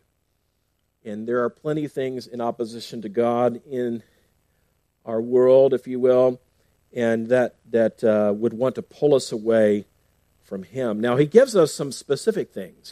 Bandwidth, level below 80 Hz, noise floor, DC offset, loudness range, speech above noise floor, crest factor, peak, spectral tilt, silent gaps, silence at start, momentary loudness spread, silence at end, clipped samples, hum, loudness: 14.5 kHz; -68 dBFS; -71 dBFS; under 0.1%; 7 LU; 50 dB; 22 dB; 0 dBFS; -6 dB/octave; none; 1.05 s; 17 LU; 0 s; under 0.1%; none; -21 LUFS